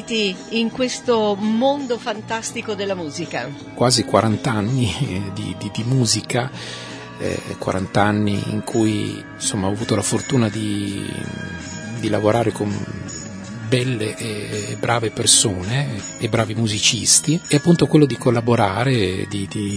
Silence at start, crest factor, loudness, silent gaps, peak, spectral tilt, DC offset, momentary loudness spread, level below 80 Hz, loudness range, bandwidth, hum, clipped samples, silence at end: 0 s; 20 dB; -20 LUFS; none; 0 dBFS; -4 dB/octave; under 0.1%; 13 LU; -50 dBFS; 6 LU; 11 kHz; none; under 0.1%; 0 s